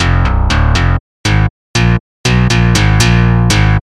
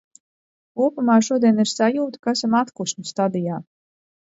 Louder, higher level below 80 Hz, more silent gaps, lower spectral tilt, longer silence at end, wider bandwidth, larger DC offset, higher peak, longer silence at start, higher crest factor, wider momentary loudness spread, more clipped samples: first, -11 LUFS vs -20 LUFS; first, -16 dBFS vs -70 dBFS; first, 1.00-1.24 s, 1.50-1.74 s, 2.00-2.24 s vs 2.19-2.23 s; about the same, -5 dB/octave vs -5 dB/octave; second, 0.2 s vs 0.7 s; first, 13 kHz vs 8 kHz; neither; first, 0 dBFS vs -4 dBFS; second, 0 s vs 0.75 s; second, 10 dB vs 18 dB; second, 6 LU vs 10 LU; neither